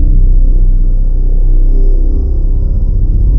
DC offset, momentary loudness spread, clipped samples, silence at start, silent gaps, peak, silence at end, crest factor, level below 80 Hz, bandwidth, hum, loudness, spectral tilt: under 0.1%; 3 LU; under 0.1%; 0 s; none; 0 dBFS; 0 s; 6 dB; -6 dBFS; 0.8 kHz; none; -14 LUFS; -12.5 dB/octave